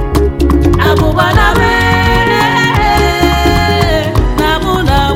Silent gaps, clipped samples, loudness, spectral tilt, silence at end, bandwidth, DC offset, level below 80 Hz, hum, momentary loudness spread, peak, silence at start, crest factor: none; 0.1%; -10 LUFS; -5.5 dB/octave; 0 s; 16.5 kHz; under 0.1%; -16 dBFS; none; 3 LU; 0 dBFS; 0 s; 10 dB